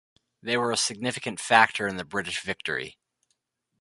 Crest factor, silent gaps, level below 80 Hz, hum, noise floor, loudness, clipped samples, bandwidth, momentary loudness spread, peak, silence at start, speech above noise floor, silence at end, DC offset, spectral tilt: 26 dB; none; -64 dBFS; none; -76 dBFS; -26 LUFS; under 0.1%; 11.5 kHz; 13 LU; -2 dBFS; 0.45 s; 50 dB; 0.9 s; under 0.1%; -2.5 dB/octave